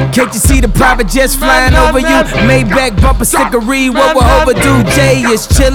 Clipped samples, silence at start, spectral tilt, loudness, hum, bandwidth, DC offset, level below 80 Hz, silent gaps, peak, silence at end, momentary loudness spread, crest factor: 0.1%; 0 s; -4.5 dB/octave; -9 LUFS; none; 19.5 kHz; under 0.1%; -14 dBFS; none; 0 dBFS; 0 s; 3 LU; 8 dB